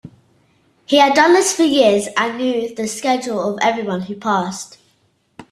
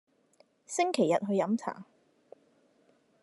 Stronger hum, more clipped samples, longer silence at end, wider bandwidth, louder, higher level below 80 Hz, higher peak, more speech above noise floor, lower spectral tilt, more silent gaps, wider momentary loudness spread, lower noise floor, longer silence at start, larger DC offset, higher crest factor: neither; neither; second, 0.1 s vs 1.4 s; first, 13.5 kHz vs 11.5 kHz; first, -16 LUFS vs -30 LUFS; first, -62 dBFS vs -86 dBFS; first, -2 dBFS vs -14 dBFS; first, 45 dB vs 38 dB; second, -3.5 dB/octave vs -5 dB/octave; neither; about the same, 12 LU vs 13 LU; second, -61 dBFS vs -68 dBFS; second, 0.05 s vs 0.7 s; neither; about the same, 16 dB vs 20 dB